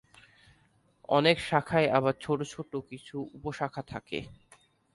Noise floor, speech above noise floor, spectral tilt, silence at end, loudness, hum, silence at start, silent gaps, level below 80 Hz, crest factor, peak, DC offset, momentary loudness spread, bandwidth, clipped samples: -67 dBFS; 37 dB; -5.5 dB/octave; 0.6 s; -30 LUFS; none; 1.1 s; none; -62 dBFS; 22 dB; -8 dBFS; under 0.1%; 15 LU; 11.5 kHz; under 0.1%